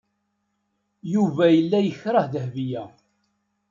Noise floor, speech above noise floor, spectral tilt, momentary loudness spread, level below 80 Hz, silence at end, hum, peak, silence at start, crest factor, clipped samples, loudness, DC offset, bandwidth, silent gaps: -74 dBFS; 53 dB; -8 dB/octave; 13 LU; -70 dBFS; 0.8 s; none; -6 dBFS; 1.05 s; 18 dB; under 0.1%; -22 LUFS; under 0.1%; 7.4 kHz; none